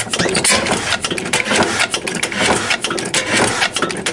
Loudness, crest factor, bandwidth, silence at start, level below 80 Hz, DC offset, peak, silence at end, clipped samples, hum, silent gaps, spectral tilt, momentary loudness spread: -15 LUFS; 16 dB; 11.5 kHz; 0 s; -46 dBFS; under 0.1%; 0 dBFS; 0 s; under 0.1%; none; none; -2 dB/octave; 5 LU